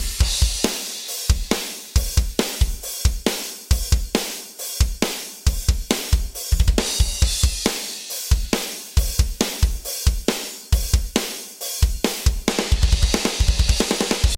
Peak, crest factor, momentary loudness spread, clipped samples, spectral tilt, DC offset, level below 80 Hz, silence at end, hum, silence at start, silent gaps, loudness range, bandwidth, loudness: -2 dBFS; 18 dB; 5 LU; under 0.1%; -3.5 dB/octave; under 0.1%; -22 dBFS; 0 s; none; 0 s; none; 2 LU; 17 kHz; -22 LUFS